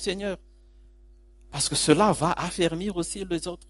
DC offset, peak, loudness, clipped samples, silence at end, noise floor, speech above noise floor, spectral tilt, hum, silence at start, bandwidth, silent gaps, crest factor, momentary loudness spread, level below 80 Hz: under 0.1%; -6 dBFS; -25 LUFS; under 0.1%; 0.05 s; -53 dBFS; 27 dB; -4 dB/octave; none; 0 s; 11.5 kHz; none; 22 dB; 13 LU; -48 dBFS